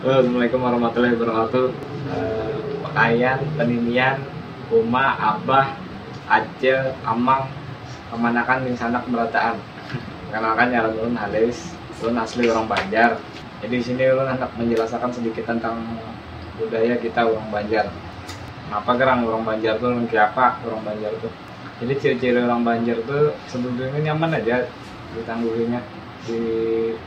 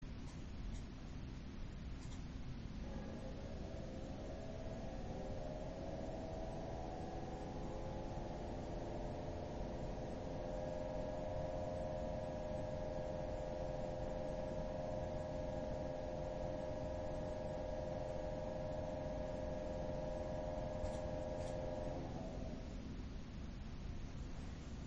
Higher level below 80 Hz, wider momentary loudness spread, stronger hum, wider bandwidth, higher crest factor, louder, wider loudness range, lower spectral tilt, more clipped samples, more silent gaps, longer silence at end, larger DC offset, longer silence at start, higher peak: about the same, -50 dBFS vs -52 dBFS; first, 14 LU vs 6 LU; neither; about the same, 8.8 kHz vs 8.2 kHz; first, 20 dB vs 14 dB; first, -21 LUFS vs -47 LUFS; about the same, 3 LU vs 4 LU; about the same, -6.5 dB/octave vs -7 dB/octave; neither; neither; about the same, 0 s vs 0 s; neither; about the same, 0 s vs 0 s; first, 0 dBFS vs -30 dBFS